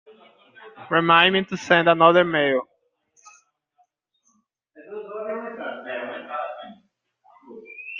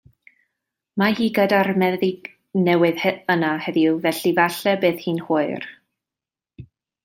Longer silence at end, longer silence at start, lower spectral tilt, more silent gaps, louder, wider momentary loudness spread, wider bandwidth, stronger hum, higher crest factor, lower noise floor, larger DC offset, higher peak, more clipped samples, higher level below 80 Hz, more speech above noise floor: second, 0 s vs 0.4 s; second, 0.6 s vs 0.95 s; about the same, -5 dB/octave vs -6 dB/octave; neither; about the same, -20 LUFS vs -20 LUFS; first, 23 LU vs 9 LU; second, 7.4 kHz vs 16.5 kHz; neither; about the same, 22 dB vs 18 dB; second, -69 dBFS vs -89 dBFS; neither; about the same, -2 dBFS vs -4 dBFS; neither; about the same, -68 dBFS vs -64 dBFS; second, 51 dB vs 70 dB